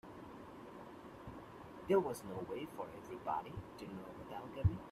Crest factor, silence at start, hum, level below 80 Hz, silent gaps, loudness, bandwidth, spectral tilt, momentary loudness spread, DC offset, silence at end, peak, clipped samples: 22 dB; 0.05 s; none; -56 dBFS; none; -42 LUFS; 15 kHz; -7.5 dB/octave; 18 LU; under 0.1%; 0 s; -20 dBFS; under 0.1%